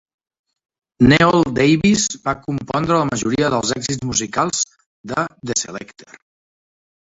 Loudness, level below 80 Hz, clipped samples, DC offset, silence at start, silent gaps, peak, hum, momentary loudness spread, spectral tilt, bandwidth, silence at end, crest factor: -17 LUFS; -46 dBFS; under 0.1%; under 0.1%; 1 s; 4.86-5.04 s; -2 dBFS; none; 10 LU; -4 dB/octave; 8 kHz; 1.3 s; 18 dB